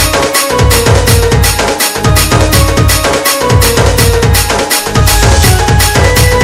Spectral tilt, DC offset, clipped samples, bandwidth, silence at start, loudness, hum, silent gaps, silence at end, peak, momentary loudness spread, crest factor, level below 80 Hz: -4 dB/octave; under 0.1%; 2%; over 20 kHz; 0 s; -8 LUFS; none; none; 0 s; 0 dBFS; 2 LU; 8 dB; -14 dBFS